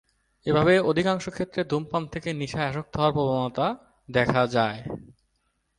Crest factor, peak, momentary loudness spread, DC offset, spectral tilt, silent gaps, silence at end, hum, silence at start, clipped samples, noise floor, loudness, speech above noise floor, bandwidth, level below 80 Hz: 20 dB; -6 dBFS; 12 LU; under 0.1%; -6.5 dB/octave; none; 0.7 s; none; 0.45 s; under 0.1%; -73 dBFS; -25 LUFS; 49 dB; 11 kHz; -54 dBFS